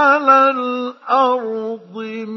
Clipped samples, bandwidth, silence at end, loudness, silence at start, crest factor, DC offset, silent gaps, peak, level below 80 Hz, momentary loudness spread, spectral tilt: under 0.1%; 6.2 kHz; 0 s; -15 LUFS; 0 s; 16 dB; under 0.1%; none; 0 dBFS; -80 dBFS; 16 LU; -5 dB/octave